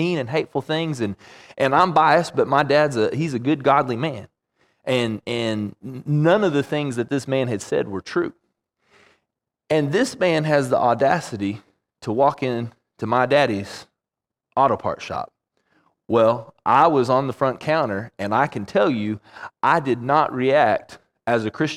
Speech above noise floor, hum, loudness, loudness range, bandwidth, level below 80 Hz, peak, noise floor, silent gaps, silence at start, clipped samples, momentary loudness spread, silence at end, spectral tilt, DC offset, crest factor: 66 dB; none; -21 LUFS; 4 LU; 14 kHz; -62 dBFS; -2 dBFS; -87 dBFS; none; 0 s; under 0.1%; 12 LU; 0 s; -6 dB/octave; under 0.1%; 18 dB